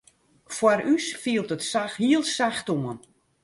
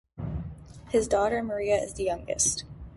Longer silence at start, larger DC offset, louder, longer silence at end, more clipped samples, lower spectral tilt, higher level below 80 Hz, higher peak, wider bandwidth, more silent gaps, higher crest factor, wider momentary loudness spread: first, 0.5 s vs 0.15 s; neither; first, -25 LUFS vs -28 LUFS; first, 0.45 s vs 0 s; neither; about the same, -4 dB/octave vs -3.5 dB/octave; second, -68 dBFS vs -46 dBFS; first, -6 dBFS vs -12 dBFS; about the same, 11.5 kHz vs 11.5 kHz; neither; about the same, 18 dB vs 18 dB; second, 9 LU vs 12 LU